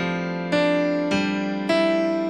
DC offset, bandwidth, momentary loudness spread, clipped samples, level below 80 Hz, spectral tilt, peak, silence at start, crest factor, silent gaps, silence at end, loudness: under 0.1%; 10 kHz; 5 LU; under 0.1%; -60 dBFS; -6 dB/octave; -8 dBFS; 0 s; 14 dB; none; 0 s; -22 LUFS